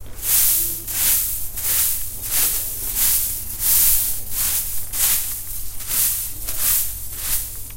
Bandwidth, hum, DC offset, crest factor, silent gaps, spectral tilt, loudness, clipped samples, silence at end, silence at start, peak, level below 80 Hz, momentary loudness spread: 16.5 kHz; none; under 0.1%; 18 dB; none; 0.5 dB/octave; -18 LUFS; under 0.1%; 0 s; 0 s; -2 dBFS; -36 dBFS; 10 LU